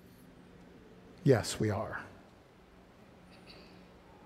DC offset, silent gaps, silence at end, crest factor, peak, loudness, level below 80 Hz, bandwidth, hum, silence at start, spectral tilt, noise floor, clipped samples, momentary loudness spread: under 0.1%; none; 0.45 s; 26 dB; -12 dBFS; -32 LUFS; -64 dBFS; 15.5 kHz; none; 0.6 s; -6 dB/octave; -59 dBFS; under 0.1%; 28 LU